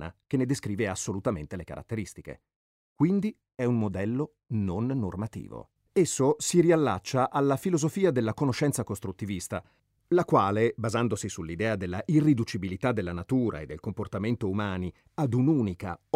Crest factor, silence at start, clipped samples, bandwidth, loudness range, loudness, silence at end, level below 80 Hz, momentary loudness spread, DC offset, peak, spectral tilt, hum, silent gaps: 20 dB; 0 s; under 0.1%; 16 kHz; 5 LU; -28 LUFS; 0.2 s; -56 dBFS; 13 LU; under 0.1%; -8 dBFS; -6 dB/octave; none; 2.56-2.96 s